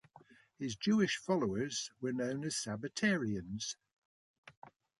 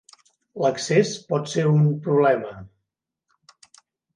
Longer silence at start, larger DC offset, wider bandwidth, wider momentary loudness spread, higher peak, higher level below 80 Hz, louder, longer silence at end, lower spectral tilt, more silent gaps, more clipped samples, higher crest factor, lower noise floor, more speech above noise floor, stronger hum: second, 0.15 s vs 0.55 s; neither; about the same, 11.5 kHz vs 10.5 kHz; second, 10 LU vs 15 LU; second, -20 dBFS vs -6 dBFS; about the same, -68 dBFS vs -64 dBFS; second, -36 LUFS vs -21 LUFS; second, 0.3 s vs 1.5 s; second, -4.5 dB/octave vs -6 dB/octave; first, 3.93-4.43 s, 4.57-4.62 s vs none; neither; about the same, 18 dB vs 18 dB; second, -63 dBFS vs -82 dBFS; second, 27 dB vs 61 dB; neither